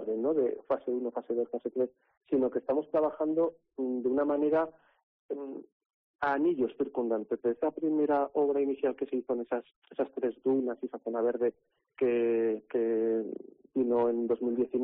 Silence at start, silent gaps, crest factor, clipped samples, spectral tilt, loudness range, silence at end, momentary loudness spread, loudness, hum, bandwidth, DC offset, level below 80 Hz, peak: 0 s; 2.17-2.21 s, 5.03-5.29 s, 5.72-5.80 s, 5.86-6.19 s, 9.76-9.82 s; 12 dB; under 0.1%; -6 dB/octave; 2 LU; 0 s; 9 LU; -31 LUFS; none; 4.3 kHz; under 0.1%; -74 dBFS; -18 dBFS